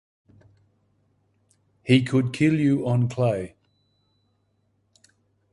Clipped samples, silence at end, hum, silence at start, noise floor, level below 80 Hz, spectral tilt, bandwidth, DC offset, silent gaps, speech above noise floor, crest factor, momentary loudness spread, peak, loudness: under 0.1%; 2.05 s; none; 1.85 s; -69 dBFS; -60 dBFS; -7.5 dB/octave; 11.5 kHz; under 0.1%; none; 48 dB; 20 dB; 12 LU; -6 dBFS; -22 LUFS